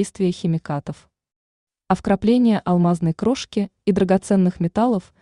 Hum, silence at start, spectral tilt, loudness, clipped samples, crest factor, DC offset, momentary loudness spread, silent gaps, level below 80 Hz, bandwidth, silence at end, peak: none; 0 s; -7.5 dB/octave; -20 LUFS; under 0.1%; 16 dB; under 0.1%; 8 LU; 1.36-1.67 s; -50 dBFS; 11 kHz; 0.2 s; -4 dBFS